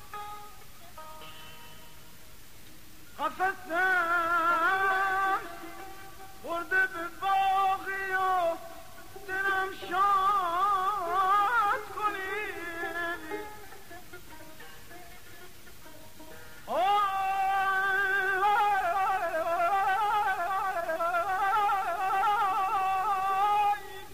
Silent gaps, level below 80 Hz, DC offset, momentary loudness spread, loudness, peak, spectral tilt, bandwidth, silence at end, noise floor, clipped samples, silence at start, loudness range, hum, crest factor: none; -60 dBFS; 0.5%; 22 LU; -28 LUFS; -18 dBFS; -2.5 dB/octave; 15.5 kHz; 0 s; -53 dBFS; under 0.1%; 0 s; 11 LU; none; 12 dB